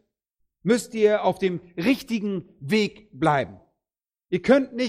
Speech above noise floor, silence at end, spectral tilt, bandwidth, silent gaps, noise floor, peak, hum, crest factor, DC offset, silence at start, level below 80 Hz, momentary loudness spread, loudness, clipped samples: over 67 dB; 0 s; -5.5 dB/octave; 16 kHz; none; under -90 dBFS; -4 dBFS; none; 20 dB; under 0.1%; 0.65 s; -60 dBFS; 10 LU; -24 LUFS; under 0.1%